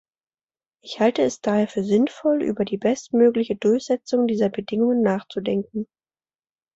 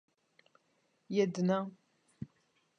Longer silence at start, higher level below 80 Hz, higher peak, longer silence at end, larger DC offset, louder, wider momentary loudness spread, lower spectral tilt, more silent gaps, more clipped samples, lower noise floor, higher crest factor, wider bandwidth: second, 0.85 s vs 1.1 s; first, -64 dBFS vs -78 dBFS; first, -6 dBFS vs -18 dBFS; first, 0.9 s vs 0.55 s; neither; first, -22 LUFS vs -34 LUFS; second, 7 LU vs 19 LU; about the same, -6 dB/octave vs -7 dB/octave; neither; neither; first, under -90 dBFS vs -76 dBFS; about the same, 16 dB vs 20 dB; second, 8 kHz vs 9 kHz